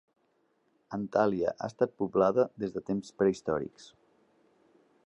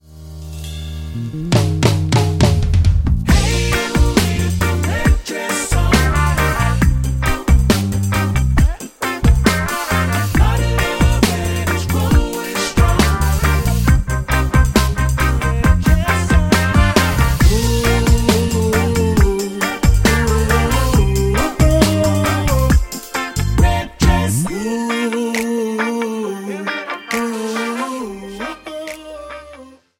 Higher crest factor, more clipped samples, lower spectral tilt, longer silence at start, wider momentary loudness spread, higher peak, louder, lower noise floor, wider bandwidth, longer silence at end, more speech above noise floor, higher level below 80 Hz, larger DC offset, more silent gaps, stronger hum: first, 20 dB vs 14 dB; neither; first, -7 dB/octave vs -5.5 dB/octave; first, 0.9 s vs 0.1 s; about the same, 10 LU vs 10 LU; second, -12 dBFS vs 0 dBFS; second, -30 LUFS vs -16 LUFS; first, -73 dBFS vs -40 dBFS; second, 8.6 kHz vs 17 kHz; first, 1.2 s vs 0.3 s; first, 43 dB vs 25 dB; second, -66 dBFS vs -20 dBFS; neither; neither; neither